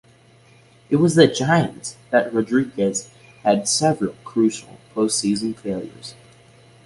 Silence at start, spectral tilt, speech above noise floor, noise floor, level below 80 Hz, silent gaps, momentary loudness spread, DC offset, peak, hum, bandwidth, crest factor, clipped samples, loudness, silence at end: 0.9 s; -4.5 dB/octave; 32 dB; -52 dBFS; -58 dBFS; none; 16 LU; under 0.1%; -2 dBFS; none; 11.5 kHz; 20 dB; under 0.1%; -20 LUFS; 0.75 s